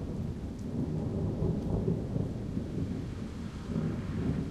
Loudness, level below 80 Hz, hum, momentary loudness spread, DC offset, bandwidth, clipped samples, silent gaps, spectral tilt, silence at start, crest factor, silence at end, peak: -35 LUFS; -44 dBFS; none; 7 LU; under 0.1%; 11.5 kHz; under 0.1%; none; -9 dB/octave; 0 s; 16 dB; 0 s; -16 dBFS